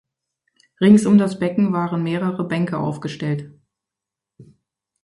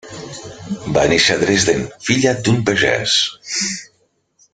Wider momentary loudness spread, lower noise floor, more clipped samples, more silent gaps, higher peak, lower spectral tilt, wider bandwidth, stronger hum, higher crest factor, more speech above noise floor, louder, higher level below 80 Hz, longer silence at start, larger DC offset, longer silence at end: second, 12 LU vs 16 LU; first, -86 dBFS vs -62 dBFS; neither; neither; about the same, 0 dBFS vs 0 dBFS; first, -7.5 dB/octave vs -3.5 dB/octave; first, 11.5 kHz vs 9.6 kHz; neither; about the same, 20 dB vs 18 dB; first, 68 dB vs 45 dB; second, -19 LUFS vs -15 LUFS; second, -60 dBFS vs -46 dBFS; first, 0.8 s vs 0.05 s; neither; about the same, 0.6 s vs 0.7 s